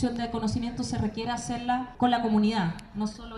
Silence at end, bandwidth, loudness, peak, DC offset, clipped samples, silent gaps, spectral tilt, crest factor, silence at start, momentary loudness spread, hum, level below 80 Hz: 0 s; 11.5 kHz; -28 LUFS; -12 dBFS; under 0.1%; under 0.1%; none; -5.5 dB/octave; 16 dB; 0 s; 8 LU; none; -48 dBFS